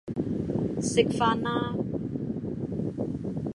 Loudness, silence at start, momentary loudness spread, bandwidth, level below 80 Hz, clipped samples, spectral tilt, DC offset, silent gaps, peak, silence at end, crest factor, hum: -29 LUFS; 0.05 s; 8 LU; 11.5 kHz; -50 dBFS; under 0.1%; -6 dB/octave; under 0.1%; none; -6 dBFS; 0.05 s; 22 dB; none